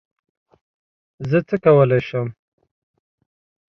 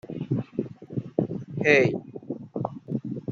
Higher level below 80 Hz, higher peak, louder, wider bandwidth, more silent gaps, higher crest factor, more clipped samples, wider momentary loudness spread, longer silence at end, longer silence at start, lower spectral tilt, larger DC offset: first, -56 dBFS vs -64 dBFS; about the same, -2 dBFS vs -4 dBFS; first, -18 LUFS vs -27 LUFS; second, 6.2 kHz vs 7.4 kHz; neither; about the same, 20 dB vs 24 dB; neither; about the same, 15 LU vs 16 LU; first, 1.5 s vs 0 s; first, 1.2 s vs 0.05 s; first, -9.5 dB/octave vs -7 dB/octave; neither